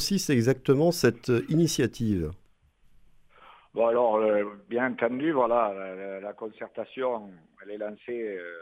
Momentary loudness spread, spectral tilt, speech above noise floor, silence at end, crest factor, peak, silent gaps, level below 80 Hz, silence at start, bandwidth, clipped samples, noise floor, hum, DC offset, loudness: 14 LU; -5.5 dB/octave; 34 dB; 0 s; 22 dB; -6 dBFS; none; -56 dBFS; 0 s; 16 kHz; under 0.1%; -61 dBFS; none; under 0.1%; -27 LUFS